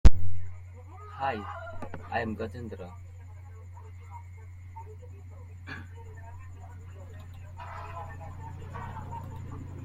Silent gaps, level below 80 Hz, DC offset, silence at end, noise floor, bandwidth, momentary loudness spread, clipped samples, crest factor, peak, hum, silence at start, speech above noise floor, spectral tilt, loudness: none; -36 dBFS; under 0.1%; 0.1 s; -45 dBFS; 7.8 kHz; 13 LU; under 0.1%; 24 dB; -2 dBFS; none; 0.05 s; 11 dB; -7 dB/octave; -39 LUFS